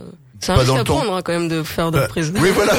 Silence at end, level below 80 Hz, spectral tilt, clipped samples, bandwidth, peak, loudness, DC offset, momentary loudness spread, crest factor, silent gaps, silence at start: 0 s; -34 dBFS; -5 dB/octave; under 0.1%; 17 kHz; 0 dBFS; -18 LUFS; under 0.1%; 5 LU; 18 dB; none; 0 s